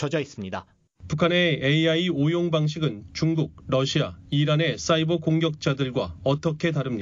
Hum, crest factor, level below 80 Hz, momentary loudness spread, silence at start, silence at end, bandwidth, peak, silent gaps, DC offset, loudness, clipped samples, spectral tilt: none; 18 dB; -54 dBFS; 8 LU; 0 s; 0 s; 7.6 kHz; -6 dBFS; none; under 0.1%; -24 LUFS; under 0.1%; -6 dB/octave